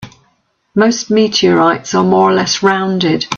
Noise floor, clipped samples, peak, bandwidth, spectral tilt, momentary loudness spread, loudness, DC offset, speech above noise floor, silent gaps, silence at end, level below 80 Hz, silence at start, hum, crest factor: -59 dBFS; under 0.1%; 0 dBFS; 7.6 kHz; -4.5 dB/octave; 4 LU; -12 LUFS; under 0.1%; 48 dB; none; 0 s; -54 dBFS; 0 s; none; 12 dB